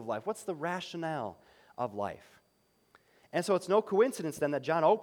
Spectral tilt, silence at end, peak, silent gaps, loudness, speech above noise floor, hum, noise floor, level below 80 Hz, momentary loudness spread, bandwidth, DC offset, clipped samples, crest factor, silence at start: -5.5 dB/octave; 0 s; -14 dBFS; none; -32 LUFS; 40 dB; none; -71 dBFS; -76 dBFS; 11 LU; 18.5 kHz; under 0.1%; under 0.1%; 20 dB; 0 s